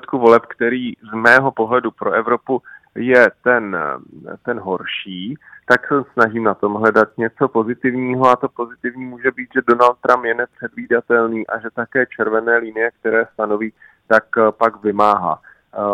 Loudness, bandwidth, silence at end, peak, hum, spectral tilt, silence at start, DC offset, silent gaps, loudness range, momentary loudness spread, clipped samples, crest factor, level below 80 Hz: -17 LUFS; 10.5 kHz; 0 s; 0 dBFS; none; -6.5 dB/octave; 0.1 s; under 0.1%; none; 3 LU; 13 LU; 0.1%; 18 dB; -62 dBFS